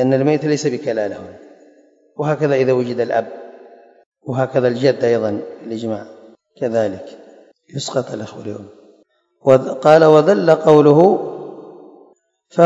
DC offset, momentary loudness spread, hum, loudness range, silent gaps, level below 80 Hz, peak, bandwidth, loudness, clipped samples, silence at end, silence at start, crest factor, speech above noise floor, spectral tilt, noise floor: under 0.1%; 22 LU; none; 12 LU; 4.06-4.12 s; -64 dBFS; 0 dBFS; 8 kHz; -16 LUFS; 0.1%; 0 s; 0 s; 16 dB; 41 dB; -6.5 dB/octave; -56 dBFS